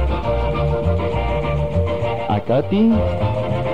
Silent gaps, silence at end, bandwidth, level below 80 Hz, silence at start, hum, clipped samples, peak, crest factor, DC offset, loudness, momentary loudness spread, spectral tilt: none; 0 s; 8 kHz; -26 dBFS; 0 s; none; under 0.1%; -6 dBFS; 12 dB; 2%; -19 LUFS; 5 LU; -9 dB/octave